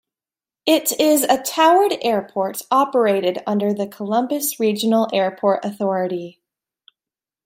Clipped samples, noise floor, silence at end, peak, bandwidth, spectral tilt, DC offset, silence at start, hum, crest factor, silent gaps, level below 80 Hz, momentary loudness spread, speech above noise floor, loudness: under 0.1%; under -90 dBFS; 1.15 s; -2 dBFS; 16 kHz; -4 dB/octave; under 0.1%; 0.65 s; none; 18 dB; none; -70 dBFS; 9 LU; over 72 dB; -19 LUFS